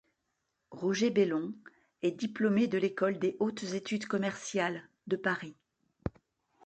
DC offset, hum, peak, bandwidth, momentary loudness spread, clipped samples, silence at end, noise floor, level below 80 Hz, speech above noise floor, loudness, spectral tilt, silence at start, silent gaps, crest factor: under 0.1%; none; -16 dBFS; 9 kHz; 14 LU; under 0.1%; 0.55 s; -82 dBFS; -64 dBFS; 51 dB; -33 LUFS; -5.5 dB/octave; 0.7 s; none; 18 dB